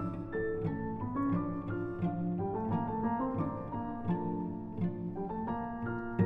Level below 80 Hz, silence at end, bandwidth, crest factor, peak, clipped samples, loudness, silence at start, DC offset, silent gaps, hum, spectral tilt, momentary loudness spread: -54 dBFS; 0 s; 3.9 kHz; 18 dB; -16 dBFS; under 0.1%; -36 LUFS; 0 s; under 0.1%; none; none; -11.5 dB/octave; 5 LU